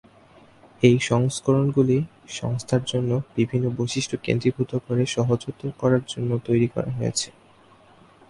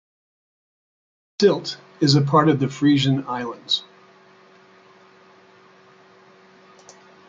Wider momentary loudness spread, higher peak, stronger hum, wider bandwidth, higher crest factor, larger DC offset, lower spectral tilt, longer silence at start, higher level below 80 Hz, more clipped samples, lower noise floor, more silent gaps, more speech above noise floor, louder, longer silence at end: second, 8 LU vs 12 LU; about the same, -2 dBFS vs -4 dBFS; neither; first, 11.5 kHz vs 7.8 kHz; about the same, 20 dB vs 20 dB; neither; about the same, -6 dB/octave vs -6 dB/octave; second, 0.8 s vs 1.4 s; first, -54 dBFS vs -64 dBFS; neither; about the same, -53 dBFS vs -51 dBFS; neither; about the same, 31 dB vs 33 dB; second, -23 LUFS vs -20 LUFS; second, 1 s vs 3.5 s